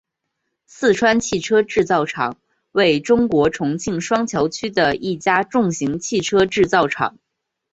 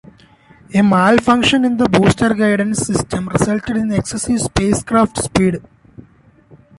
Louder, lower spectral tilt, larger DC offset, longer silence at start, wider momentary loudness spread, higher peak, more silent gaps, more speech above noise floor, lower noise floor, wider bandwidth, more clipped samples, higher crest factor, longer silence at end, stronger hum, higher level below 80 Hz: second, -18 LUFS vs -15 LUFS; about the same, -4.5 dB/octave vs -5 dB/octave; neither; about the same, 0.8 s vs 0.7 s; about the same, 7 LU vs 7 LU; about the same, -2 dBFS vs 0 dBFS; neither; first, 58 dB vs 34 dB; first, -76 dBFS vs -48 dBFS; second, 8.2 kHz vs 11.5 kHz; neither; about the same, 16 dB vs 14 dB; second, 0.65 s vs 1.2 s; neither; second, -50 dBFS vs -38 dBFS